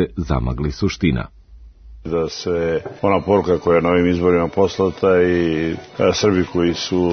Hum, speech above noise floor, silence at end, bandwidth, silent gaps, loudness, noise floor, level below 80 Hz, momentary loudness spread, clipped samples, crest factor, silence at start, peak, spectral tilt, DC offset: none; 25 dB; 0 s; 6.6 kHz; none; -18 LUFS; -42 dBFS; -36 dBFS; 7 LU; under 0.1%; 16 dB; 0 s; -2 dBFS; -6 dB/octave; under 0.1%